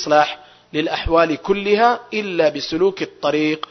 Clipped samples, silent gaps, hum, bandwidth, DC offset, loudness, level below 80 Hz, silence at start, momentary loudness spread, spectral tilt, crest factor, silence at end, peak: under 0.1%; none; none; 6.4 kHz; under 0.1%; -18 LUFS; -38 dBFS; 0 s; 7 LU; -5 dB/octave; 16 dB; 0.1 s; -2 dBFS